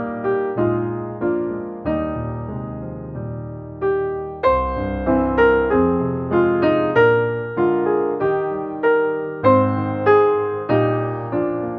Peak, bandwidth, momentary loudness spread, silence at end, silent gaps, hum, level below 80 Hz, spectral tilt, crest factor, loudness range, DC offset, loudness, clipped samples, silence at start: -2 dBFS; 5.2 kHz; 13 LU; 0 s; none; none; -40 dBFS; -10 dB/octave; 16 dB; 7 LU; under 0.1%; -19 LUFS; under 0.1%; 0 s